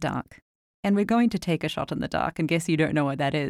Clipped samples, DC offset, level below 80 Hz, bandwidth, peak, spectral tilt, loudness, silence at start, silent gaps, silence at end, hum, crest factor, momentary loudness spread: under 0.1%; under 0.1%; -54 dBFS; 14.5 kHz; -10 dBFS; -6 dB/octave; -25 LUFS; 0 s; 0.42-0.83 s; 0 s; none; 16 dB; 8 LU